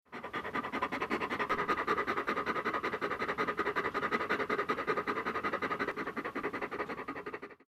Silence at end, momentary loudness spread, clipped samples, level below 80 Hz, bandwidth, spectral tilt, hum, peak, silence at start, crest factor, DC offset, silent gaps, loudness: 0.15 s; 7 LU; under 0.1%; -64 dBFS; 15 kHz; -5 dB/octave; none; -18 dBFS; 0.1 s; 18 dB; under 0.1%; none; -35 LUFS